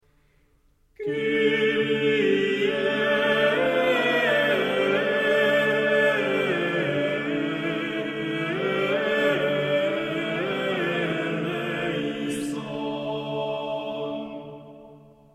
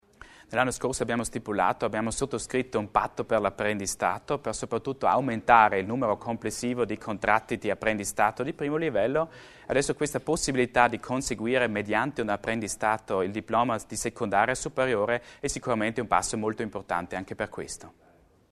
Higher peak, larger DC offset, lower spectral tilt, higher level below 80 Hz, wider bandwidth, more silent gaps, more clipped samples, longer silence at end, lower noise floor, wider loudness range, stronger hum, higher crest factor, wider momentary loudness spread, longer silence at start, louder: second, -10 dBFS vs -4 dBFS; neither; first, -5.5 dB/octave vs -4 dB/octave; second, -64 dBFS vs -52 dBFS; about the same, 13.5 kHz vs 13.5 kHz; neither; neither; second, 0.35 s vs 0.6 s; first, -62 dBFS vs -52 dBFS; first, 7 LU vs 3 LU; neither; second, 16 dB vs 24 dB; about the same, 9 LU vs 7 LU; first, 1 s vs 0.2 s; first, -24 LUFS vs -27 LUFS